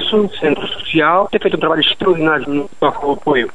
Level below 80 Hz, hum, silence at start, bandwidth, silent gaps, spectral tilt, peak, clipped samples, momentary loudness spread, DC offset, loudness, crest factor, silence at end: -46 dBFS; none; 0 s; 10.5 kHz; none; -6 dB/octave; 0 dBFS; under 0.1%; 5 LU; 3%; -15 LUFS; 14 dB; 0.05 s